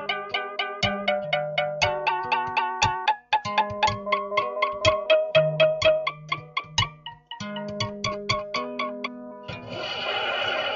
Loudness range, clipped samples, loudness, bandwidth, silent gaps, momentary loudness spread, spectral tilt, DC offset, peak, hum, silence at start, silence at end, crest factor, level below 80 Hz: 7 LU; under 0.1%; -25 LUFS; 7.6 kHz; none; 13 LU; -1.5 dB/octave; under 0.1%; -4 dBFS; none; 0 s; 0 s; 22 dB; -52 dBFS